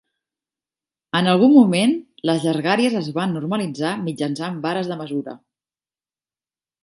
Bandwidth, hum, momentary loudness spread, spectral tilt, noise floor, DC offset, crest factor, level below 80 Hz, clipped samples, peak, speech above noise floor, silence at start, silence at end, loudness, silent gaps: 11.5 kHz; none; 13 LU; -6 dB/octave; under -90 dBFS; under 0.1%; 20 dB; -70 dBFS; under 0.1%; -2 dBFS; over 71 dB; 1.15 s; 1.45 s; -19 LUFS; none